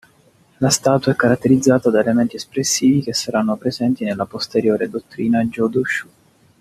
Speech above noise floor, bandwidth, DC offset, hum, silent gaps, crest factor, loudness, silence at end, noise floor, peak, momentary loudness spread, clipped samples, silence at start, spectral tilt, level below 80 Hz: 37 dB; 14.5 kHz; under 0.1%; none; none; 16 dB; -18 LUFS; 0.55 s; -54 dBFS; -2 dBFS; 8 LU; under 0.1%; 0.6 s; -4.5 dB/octave; -56 dBFS